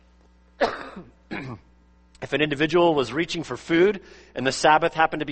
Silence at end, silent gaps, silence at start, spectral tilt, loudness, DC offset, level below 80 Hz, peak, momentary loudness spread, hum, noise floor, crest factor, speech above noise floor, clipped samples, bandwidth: 0 s; none; 0.6 s; -4.5 dB/octave; -22 LUFS; under 0.1%; -54 dBFS; -4 dBFS; 18 LU; none; -56 dBFS; 20 dB; 33 dB; under 0.1%; 8.8 kHz